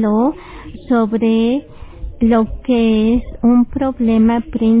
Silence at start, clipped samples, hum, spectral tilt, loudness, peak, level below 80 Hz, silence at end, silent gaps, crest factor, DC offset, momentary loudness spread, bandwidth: 0 s; under 0.1%; none; -11.5 dB/octave; -15 LUFS; -4 dBFS; -32 dBFS; 0 s; none; 12 dB; under 0.1%; 16 LU; 4 kHz